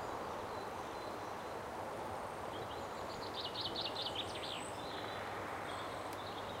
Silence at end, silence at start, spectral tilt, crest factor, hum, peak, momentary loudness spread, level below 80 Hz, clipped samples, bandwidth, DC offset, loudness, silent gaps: 0 s; 0 s; -3.5 dB/octave; 14 dB; none; -28 dBFS; 5 LU; -66 dBFS; under 0.1%; 16 kHz; under 0.1%; -43 LUFS; none